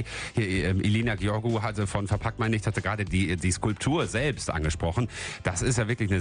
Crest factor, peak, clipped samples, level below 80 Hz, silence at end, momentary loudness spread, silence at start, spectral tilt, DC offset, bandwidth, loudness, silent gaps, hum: 16 dB; -10 dBFS; under 0.1%; -42 dBFS; 0 s; 4 LU; 0 s; -5.5 dB/octave; under 0.1%; 10.5 kHz; -27 LUFS; none; none